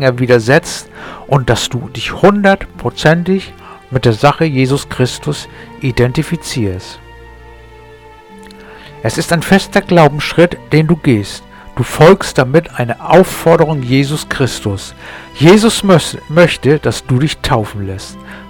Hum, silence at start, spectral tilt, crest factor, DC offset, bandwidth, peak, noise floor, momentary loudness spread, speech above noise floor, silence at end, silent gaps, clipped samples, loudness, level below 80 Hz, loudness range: none; 0 s; -5.5 dB/octave; 12 dB; 0.2%; 18.5 kHz; 0 dBFS; -37 dBFS; 15 LU; 25 dB; 0 s; none; 0.3%; -12 LUFS; -36 dBFS; 8 LU